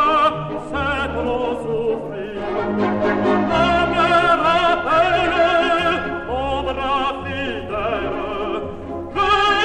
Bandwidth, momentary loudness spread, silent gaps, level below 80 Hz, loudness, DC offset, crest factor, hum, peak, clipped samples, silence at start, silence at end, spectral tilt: 10.5 kHz; 10 LU; none; -38 dBFS; -19 LUFS; under 0.1%; 14 dB; none; -4 dBFS; under 0.1%; 0 s; 0 s; -5.5 dB/octave